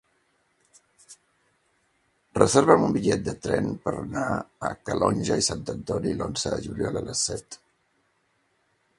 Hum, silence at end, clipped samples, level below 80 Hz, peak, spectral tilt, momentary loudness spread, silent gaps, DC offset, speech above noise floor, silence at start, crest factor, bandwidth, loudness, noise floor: none; 1.45 s; under 0.1%; -50 dBFS; 0 dBFS; -4.5 dB/octave; 13 LU; none; under 0.1%; 45 dB; 1.1 s; 26 dB; 11.5 kHz; -25 LUFS; -70 dBFS